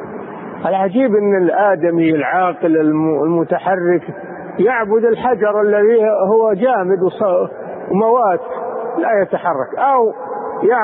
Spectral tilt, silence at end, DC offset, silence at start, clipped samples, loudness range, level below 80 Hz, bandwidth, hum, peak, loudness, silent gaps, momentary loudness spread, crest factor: -12.5 dB/octave; 0 s; under 0.1%; 0 s; under 0.1%; 2 LU; -62 dBFS; 4 kHz; none; -2 dBFS; -15 LUFS; none; 10 LU; 12 dB